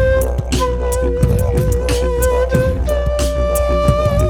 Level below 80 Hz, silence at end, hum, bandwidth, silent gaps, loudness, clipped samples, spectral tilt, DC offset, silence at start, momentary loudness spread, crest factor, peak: -18 dBFS; 0 s; none; 18 kHz; none; -16 LUFS; under 0.1%; -6 dB/octave; under 0.1%; 0 s; 3 LU; 14 dB; 0 dBFS